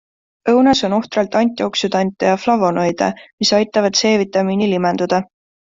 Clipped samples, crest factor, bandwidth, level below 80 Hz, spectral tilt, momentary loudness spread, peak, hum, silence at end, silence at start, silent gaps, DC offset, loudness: under 0.1%; 14 dB; 7.8 kHz; -54 dBFS; -4.5 dB/octave; 5 LU; -2 dBFS; none; 0.5 s; 0.45 s; 3.33-3.38 s; under 0.1%; -16 LUFS